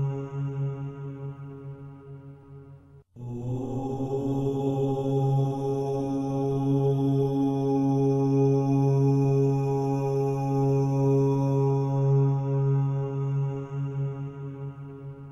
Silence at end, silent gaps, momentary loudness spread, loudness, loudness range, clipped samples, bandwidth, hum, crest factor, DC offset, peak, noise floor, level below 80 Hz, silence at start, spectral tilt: 0 s; none; 16 LU; -26 LUFS; 11 LU; under 0.1%; 6.6 kHz; none; 12 dB; under 0.1%; -14 dBFS; -50 dBFS; -56 dBFS; 0 s; -10 dB/octave